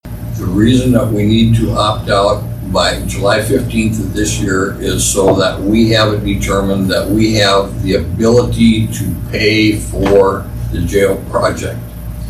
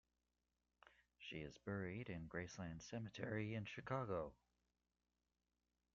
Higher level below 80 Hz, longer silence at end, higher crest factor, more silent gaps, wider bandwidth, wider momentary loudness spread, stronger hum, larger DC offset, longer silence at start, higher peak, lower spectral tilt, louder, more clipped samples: first, -26 dBFS vs -74 dBFS; second, 0 s vs 1.6 s; second, 12 dB vs 20 dB; neither; first, 15 kHz vs 7.2 kHz; about the same, 7 LU vs 7 LU; second, none vs 60 Hz at -70 dBFS; neither; second, 0.05 s vs 0.85 s; first, 0 dBFS vs -32 dBFS; about the same, -5 dB/octave vs -5.5 dB/octave; first, -13 LUFS vs -50 LUFS; neither